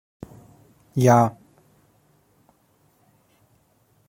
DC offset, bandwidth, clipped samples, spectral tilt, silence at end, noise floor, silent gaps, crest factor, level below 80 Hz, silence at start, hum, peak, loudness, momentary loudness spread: under 0.1%; 16.5 kHz; under 0.1%; -7 dB/octave; 2.8 s; -63 dBFS; none; 22 dB; -62 dBFS; 0.95 s; none; -4 dBFS; -19 LUFS; 27 LU